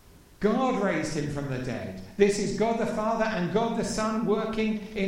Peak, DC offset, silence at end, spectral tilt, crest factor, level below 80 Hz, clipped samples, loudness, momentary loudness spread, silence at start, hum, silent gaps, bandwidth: -8 dBFS; under 0.1%; 0 s; -5.5 dB/octave; 18 dB; -48 dBFS; under 0.1%; -27 LUFS; 7 LU; 0.4 s; none; none; 16 kHz